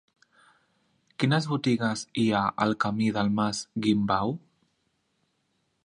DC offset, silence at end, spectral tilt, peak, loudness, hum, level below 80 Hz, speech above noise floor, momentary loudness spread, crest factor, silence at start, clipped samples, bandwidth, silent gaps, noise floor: under 0.1%; 1.5 s; -5.5 dB/octave; -8 dBFS; -26 LUFS; none; -60 dBFS; 48 dB; 4 LU; 20 dB; 1.2 s; under 0.1%; 11 kHz; none; -74 dBFS